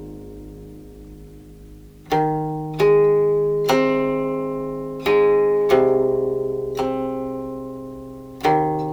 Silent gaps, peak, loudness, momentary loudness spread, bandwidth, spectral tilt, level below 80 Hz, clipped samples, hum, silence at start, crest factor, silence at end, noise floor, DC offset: none; -4 dBFS; -20 LUFS; 21 LU; 17.5 kHz; -6.5 dB/octave; -46 dBFS; under 0.1%; none; 0 s; 16 dB; 0 s; -42 dBFS; under 0.1%